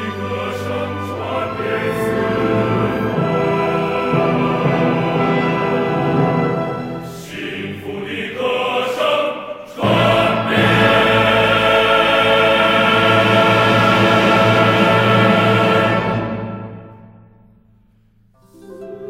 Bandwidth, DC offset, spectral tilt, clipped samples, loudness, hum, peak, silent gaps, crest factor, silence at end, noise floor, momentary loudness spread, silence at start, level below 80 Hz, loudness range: 16 kHz; under 0.1%; -6 dB/octave; under 0.1%; -15 LUFS; none; -2 dBFS; none; 14 dB; 0 s; -54 dBFS; 13 LU; 0 s; -46 dBFS; 8 LU